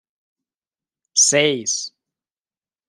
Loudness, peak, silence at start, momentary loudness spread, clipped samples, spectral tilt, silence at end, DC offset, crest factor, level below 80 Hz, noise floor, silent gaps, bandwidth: -17 LUFS; -2 dBFS; 1.15 s; 11 LU; under 0.1%; -1 dB/octave; 1 s; under 0.1%; 20 dB; -72 dBFS; under -90 dBFS; none; 13.5 kHz